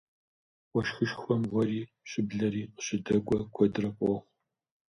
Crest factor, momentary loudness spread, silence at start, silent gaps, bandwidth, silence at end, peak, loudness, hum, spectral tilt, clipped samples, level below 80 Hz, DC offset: 20 dB; 7 LU; 0.75 s; none; 10.5 kHz; 0.65 s; -12 dBFS; -31 LUFS; none; -6 dB/octave; under 0.1%; -60 dBFS; under 0.1%